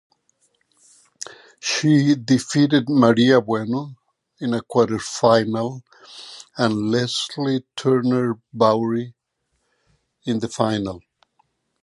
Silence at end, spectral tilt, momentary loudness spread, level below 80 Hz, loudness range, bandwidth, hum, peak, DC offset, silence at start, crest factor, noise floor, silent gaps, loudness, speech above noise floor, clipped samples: 0.85 s; -5.5 dB/octave; 20 LU; -60 dBFS; 4 LU; 11.5 kHz; none; -2 dBFS; under 0.1%; 1.25 s; 20 dB; -73 dBFS; none; -20 LUFS; 54 dB; under 0.1%